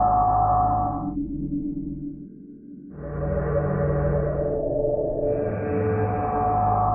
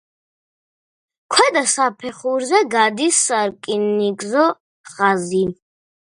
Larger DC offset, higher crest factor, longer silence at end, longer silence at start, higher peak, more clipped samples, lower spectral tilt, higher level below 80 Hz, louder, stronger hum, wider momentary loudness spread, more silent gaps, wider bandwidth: neither; second, 14 dB vs 20 dB; second, 0 s vs 0.6 s; second, 0 s vs 1.3 s; second, -10 dBFS vs 0 dBFS; neither; first, -14.5 dB/octave vs -2.5 dB/octave; first, -36 dBFS vs -62 dBFS; second, -24 LUFS vs -17 LUFS; neither; first, 17 LU vs 7 LU; second, none vs 4.60-4.84 s; second, 2.9 kHz vs 11.5 kHz